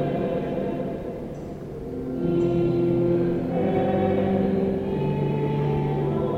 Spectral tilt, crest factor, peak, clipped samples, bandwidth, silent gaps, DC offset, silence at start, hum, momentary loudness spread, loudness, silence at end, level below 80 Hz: -10 dB/octave; 14 dB; -10 dBFS; under 0.1%; 7.4 kHz; none; under 0.1%; 0 s; none; 11 LU; -24 LUFS; 0 s; -44 dBFS